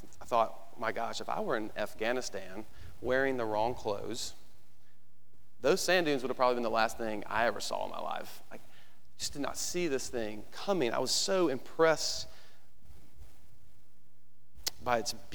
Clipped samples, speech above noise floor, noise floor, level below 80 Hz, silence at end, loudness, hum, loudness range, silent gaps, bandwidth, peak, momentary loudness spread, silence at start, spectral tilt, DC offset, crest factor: under 0.1%; 36 dB; -69 dBFS; -62 dBFS; 0.1 s; -33 LUFS; none; 5 LU; none; over 20 kHz; -12 dBFS; 13 LU; 0.05 s; -3 dB/octave; 1%; 22 dB